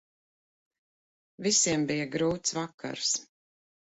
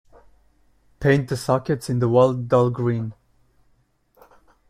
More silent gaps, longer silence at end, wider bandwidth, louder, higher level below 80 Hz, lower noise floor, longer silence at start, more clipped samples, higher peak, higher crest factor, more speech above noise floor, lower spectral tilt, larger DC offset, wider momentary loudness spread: first, 2.74-2.78 s vs none; second, 0.7 s vs 1.6 s; second, 8.2 kHz vs 14.5 kHz; second, -28 LUFS vs -21 LUFS; second, -66 dBFS vs -52 dBFS; first, under -90 dBFS vs -63 dBFS; first, 1.4 s vs 1 s; neither; second, -12 dBFS vs -6 dBFS; about the same, 20 dB vs 18 dB; first, over 61 dB vs 43 dB; second, -2.5 dB/octave vs -7.5 dB/octave; neither; first, 10 LU vs 7 LU